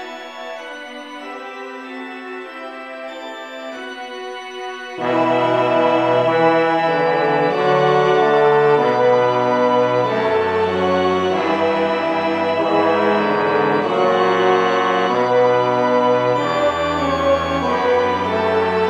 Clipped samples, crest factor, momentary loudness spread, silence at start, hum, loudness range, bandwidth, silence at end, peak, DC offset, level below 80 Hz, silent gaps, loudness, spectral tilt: under 0.1%; 14 dB; 16 LU; 0 s; none; 15 LU; 9.4 kHz; 0 s; -2 dBFS; under 0.1%; -52 dBFS; none; -16 LUFS; -6 dB/octave